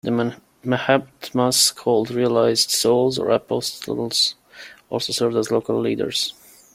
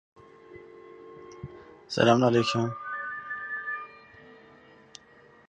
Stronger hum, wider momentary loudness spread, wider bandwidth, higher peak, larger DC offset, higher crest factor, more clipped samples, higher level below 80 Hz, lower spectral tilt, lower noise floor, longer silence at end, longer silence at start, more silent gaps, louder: neither; second, 10 LU vs 28 LU; first, 16 kHz vs 9.6 kHz; first, -2 dBFS vs -6 dBFS; neither; second, 18 dB vs 24 dB; neither; about the same, -62 dBFS vs -64 dBFS; second, -3.5 dB/octave vs -5.5 dB/octave; second, -44 dBFS vs -56 dBFS; second, 0.45 s vs 1.15 s; second, 0.05 s vs 0.5 s; neither; first, -20 LUFS vs -27 LUFS